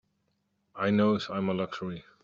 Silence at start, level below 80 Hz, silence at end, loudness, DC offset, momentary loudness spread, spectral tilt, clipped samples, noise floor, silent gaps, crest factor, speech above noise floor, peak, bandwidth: 0.75 s; -68 dBFS; 0.25 s; -29 LUFS; under 0.1%; 11 LU; -7.5 dB/octave; under 0.1%; -76 dBFS; none; 18 dB; 47 dB; -14 dBFS; 7.2 kHz